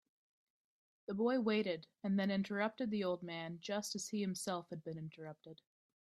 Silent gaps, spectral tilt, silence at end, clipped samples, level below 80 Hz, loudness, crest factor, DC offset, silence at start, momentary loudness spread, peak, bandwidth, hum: none; -5 dB/octave; 0.45 s; under 0.1%; -82 dBFS; -39 LUFS; 18 dB; under 0.1%; 1.1 s; 15 LU; -22 dBFS; 13.5 kHz; none